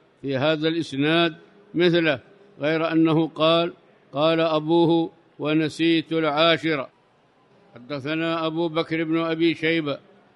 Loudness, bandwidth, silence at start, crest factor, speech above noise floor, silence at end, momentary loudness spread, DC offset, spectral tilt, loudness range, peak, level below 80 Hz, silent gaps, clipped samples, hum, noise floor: -22 LUFS; 10.5 kHz; 0.25 s; 18 dB; 38 dB; 0.4 s; 11 LU; under 0.1%; -6.5 dB/octave; 4 LU; -6 dBFS; -68 dBFS; none; under 0.1%; none; -60 dBFS